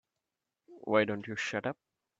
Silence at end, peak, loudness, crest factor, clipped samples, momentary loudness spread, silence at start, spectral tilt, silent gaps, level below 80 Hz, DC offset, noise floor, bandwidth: 0.45 s; -12 dBFS; -33 LUFS; 24 dB; under 0.1%; 16 LU; 0.7 s; -5 dB/octave; none; -76 dBFS; under 0.1%; -88 dBFS; 7.8 kHz